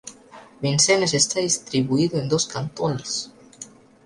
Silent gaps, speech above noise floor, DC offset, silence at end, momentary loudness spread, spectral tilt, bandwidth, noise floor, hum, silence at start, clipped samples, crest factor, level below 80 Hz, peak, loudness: none; 24 dB; under 0.1%; 0.4 s; 23 LU; -3.5 dB/octave; 11.5 kHz; -46 dBFS; none; 0.05 s; under 0.1%; 18 dB; -58 dBFS; -6 dBFS; -21 LUFS